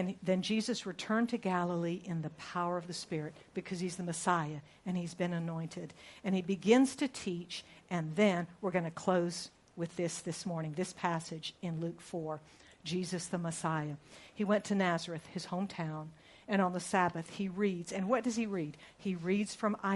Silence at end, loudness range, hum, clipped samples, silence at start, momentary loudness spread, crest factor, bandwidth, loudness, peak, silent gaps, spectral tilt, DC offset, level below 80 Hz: 0 s; 6 LU; none; under 0.1%; 0 s; 11 LU; 22 dB; 11.5 kHz; -36 LUFS; -14 dBFS; none; -5.5 dB/octave; under 0.1%; -72 dBFS